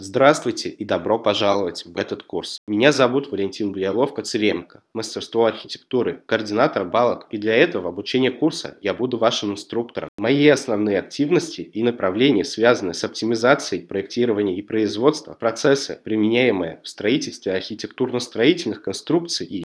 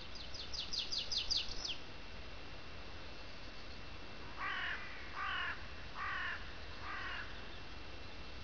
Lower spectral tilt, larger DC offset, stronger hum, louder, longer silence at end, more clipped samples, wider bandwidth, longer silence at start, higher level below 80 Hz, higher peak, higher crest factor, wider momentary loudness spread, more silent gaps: first, -4.5 dB/octave vs 0 dB/octave; second, under 0.1% vs 0.4%; neither; first, -21 LUFS vs -42 LUFS; about the same, 0.1 s vs 0 s; neither; first, 11 kHz vs 5.4 kHz; about the same, 0 s vs 0 s; second, -66 dBFS vs -56 dBFS; first, 0 dBFS vs -24 dBFS; about the same, 20 dB vs 20 dB; second, 10 LU vs 14 LU; first, 2.58-2.67 s, 10.08-10.18 s vs none